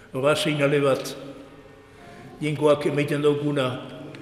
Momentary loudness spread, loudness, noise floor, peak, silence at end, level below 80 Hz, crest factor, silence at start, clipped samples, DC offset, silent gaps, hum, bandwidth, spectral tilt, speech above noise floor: 20 LU; -23 LUFS; -47 dBFS; -8 dBFS; 0 s; -60 dBFS; 16 dB; 0.15 s; under 0.1%; under 0.1%; none; none; 15 kHz; -5.5 dB/octave; 25 dB